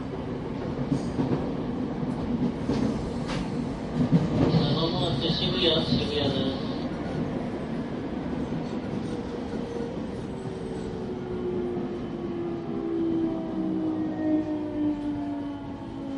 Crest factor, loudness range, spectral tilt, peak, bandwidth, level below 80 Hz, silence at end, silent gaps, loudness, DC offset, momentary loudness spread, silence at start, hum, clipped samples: 20 dB; 7 LU; -7 dB/octave; -10 dBFS; 11 kHz; -46 dBFS; 0 s; none; -29 LUFS; under 0.1%; 10 LU; 0 s; none; under 0.1%